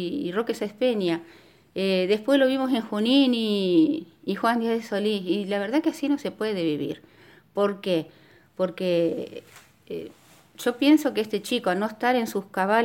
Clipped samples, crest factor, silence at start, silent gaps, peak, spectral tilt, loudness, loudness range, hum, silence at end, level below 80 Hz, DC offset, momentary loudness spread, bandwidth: under 0.1%; 16 dB; 0 s; none; -8 dBFS; -5.5 dB/octave; -25 LUFS; 6 LU; none; 0 s; -72 dBFS; under 0.1%; 14 LU; 17 kHz